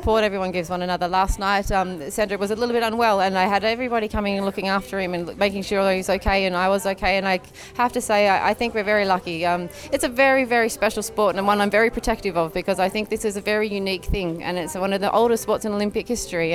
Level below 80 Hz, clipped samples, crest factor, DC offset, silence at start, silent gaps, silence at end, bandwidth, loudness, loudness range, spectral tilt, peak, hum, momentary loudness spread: -38 dBFS; under 0.1%; 16 dB; under 0.1%; 0 s; none; 0 s; 18.5 kHz; -22 LUFS; 3 LU; -4.5 dB/octave; -4 dBFS; none; 7 LU